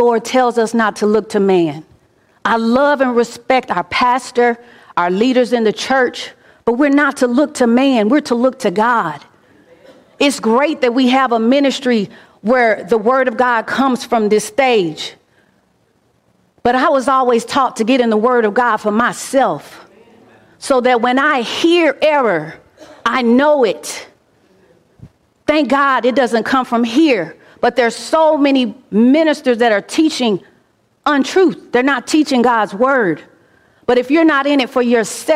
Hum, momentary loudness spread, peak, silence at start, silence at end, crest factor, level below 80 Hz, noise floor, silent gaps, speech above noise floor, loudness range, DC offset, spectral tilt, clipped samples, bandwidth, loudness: none; 7 LU; -2 dBFS; 0 s; 0 s; 12 dB; -56 dBFS; -58 dBFS; none; 44 dB; 3 LU; under 0.1%; -4.5 dB/octave; under 0.1%; 15 kHz; -14 LUFS